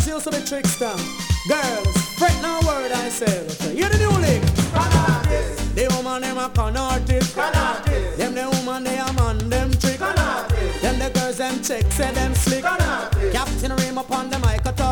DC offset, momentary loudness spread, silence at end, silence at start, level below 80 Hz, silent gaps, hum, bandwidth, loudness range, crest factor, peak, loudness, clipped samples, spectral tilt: under 0.1%; 6 LU; 0 s; 0 s; -26 dBFS; none; none; 19 kHz; 2 LU; 18 dB; -2 dBFS; -21 LUFS; under 0.1%; -4.5 dB/octave